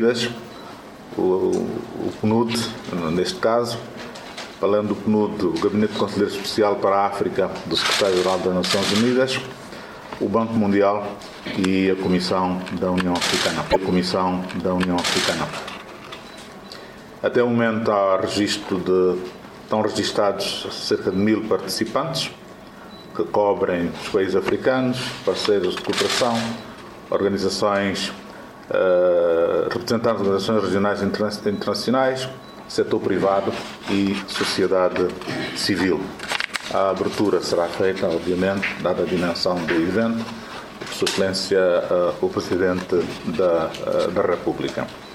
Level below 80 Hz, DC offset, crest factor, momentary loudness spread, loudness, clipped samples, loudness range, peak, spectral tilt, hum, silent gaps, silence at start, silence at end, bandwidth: -54 dBFS; under 0.1%; 18 dB; 14 LU; -21 LUFS; under 0.1%; 3 LU; -4 dBFS; -4.5 dB/octave; none; none; 0 s; 0 s; 16 kHz